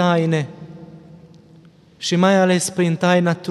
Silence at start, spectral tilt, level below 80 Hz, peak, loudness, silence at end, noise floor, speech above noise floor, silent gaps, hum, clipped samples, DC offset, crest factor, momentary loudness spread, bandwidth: 0 s; -5.5 dB/octave; -62 dBFS; -2 dBFS; -17 LUFS; 0 s; -48 dBFS; 31 dB; none; none; under 0.1%; under 0.1%; 16 dB; 16 LU; 12.5 kHz